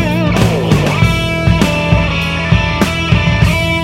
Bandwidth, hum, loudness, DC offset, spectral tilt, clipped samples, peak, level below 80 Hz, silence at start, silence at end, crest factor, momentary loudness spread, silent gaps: 16 kHz; none; -12 LUFS; under 0.1%; -6 dB/octave; under 0.1%; 0 dBFS; -22 dBFS; 0 s; 0 s; 12 dB; 2 LU; none